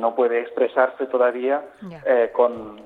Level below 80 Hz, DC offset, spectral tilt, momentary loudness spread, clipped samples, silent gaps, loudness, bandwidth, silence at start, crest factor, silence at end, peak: -64 dBFS; under 0.1%; -7.5 dB/octave; 6 LU; under 0.1%; none; -21 LUFS; 4.2 kHz; 0 s; 16 dB; 0.05 s; -4 dBFS